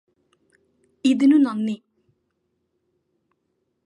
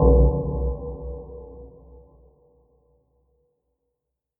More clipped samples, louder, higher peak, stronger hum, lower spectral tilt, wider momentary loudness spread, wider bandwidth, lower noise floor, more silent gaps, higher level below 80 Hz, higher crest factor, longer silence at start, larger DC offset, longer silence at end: neither; first, -20 LUFS vs -24 LUFS; second, -8 dBFS vs -4 dBFS; neither; second, -5.5 dB/octave vs -16.5 dB/octave; second, 12 LU vs 25 LU; first, 10.5 kHz vs 1.2 kHz; second, -74 dBFS vs -82 dBFS; neither; second, -76 dBFS vs -28 dBFS; about the same, 18 dB vs 22 dB; first, 1.05 s vs 0 s; neither; second, 2.1 s vs 2.7 s